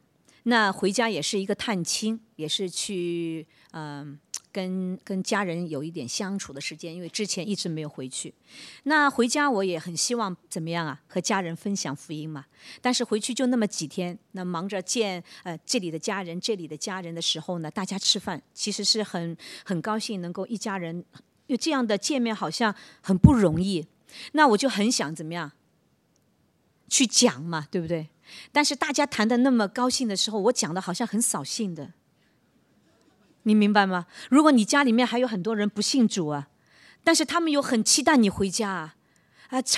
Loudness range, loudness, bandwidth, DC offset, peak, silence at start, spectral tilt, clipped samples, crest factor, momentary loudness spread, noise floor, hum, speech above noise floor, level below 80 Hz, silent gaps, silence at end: 7 LU; -25 LUFS; 14 kHz; under 0.1%; 0 dBFS; 0.45 s; -3.5 dB/octave; under 0.1%; 26 dB; 15 LU; -67 dBFS; none; 41 dB; -50 dBFS; none; 0 s